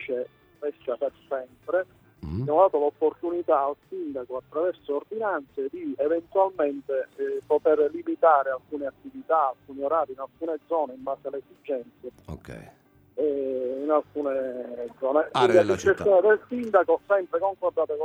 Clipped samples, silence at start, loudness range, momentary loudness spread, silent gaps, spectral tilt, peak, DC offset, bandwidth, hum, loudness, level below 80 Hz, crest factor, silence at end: under 0.1%; 0 s; 8 LU; 15 LU; none; -6 dB/octave; -6 dBFS; under 0.1%; 9.8 kHz; none; -26 LUFS; -58 dBFS; 20 dB; 0 s